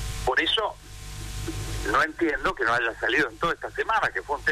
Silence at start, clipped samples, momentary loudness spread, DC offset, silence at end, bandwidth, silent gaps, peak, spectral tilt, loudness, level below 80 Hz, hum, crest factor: 0 s; under 0.1%; 12 LU; under 0.1%; 0 s; 15.5 kHz; none; -12 dBFS; -3.5 dB/octave; -25 LUFS; -40 dBFS; none; 14 dB